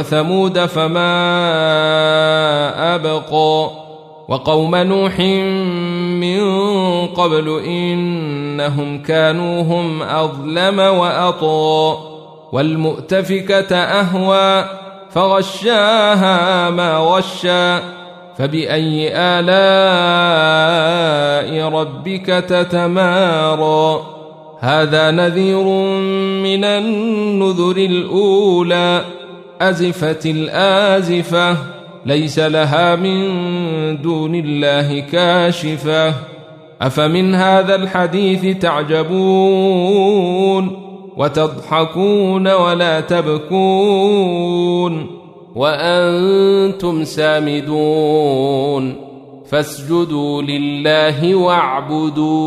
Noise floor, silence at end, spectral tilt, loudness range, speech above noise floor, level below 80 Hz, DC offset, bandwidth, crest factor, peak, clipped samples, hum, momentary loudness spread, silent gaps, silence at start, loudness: -37 dBFS; 0 s; -6 dB/octave; 3 LU; 23 dB; -56 dBFS; under 0.1%; 14 kHz; 14 dB; -2 dBFS; under 0.1%; none; 7 LU; none; 0 s; -14 LUFS